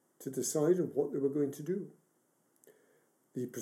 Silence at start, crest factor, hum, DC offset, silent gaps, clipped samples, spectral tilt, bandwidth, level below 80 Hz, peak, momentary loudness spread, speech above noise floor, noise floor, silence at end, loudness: 0.2 s; 18 dB; none; under 0.1%; none; under 0.1%; -6 dB/octave; 16 kHz; under -90 dBFS; -18 dBFS; 12 LU; 41 dB; -74 dBFS; 0 s; -34 LUFS